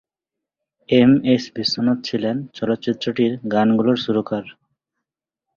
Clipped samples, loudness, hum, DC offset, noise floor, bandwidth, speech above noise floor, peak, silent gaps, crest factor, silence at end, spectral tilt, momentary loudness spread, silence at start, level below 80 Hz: under 0.1%; -19 LUFS; none; under 0.1%; -85 dBFS; 7.2 kHz; 67 dB; -2 dBFS; none; 18 dB; 1.05 s; -6.5 dB/octave; 10 LU; 0.9 s; -60 dBFS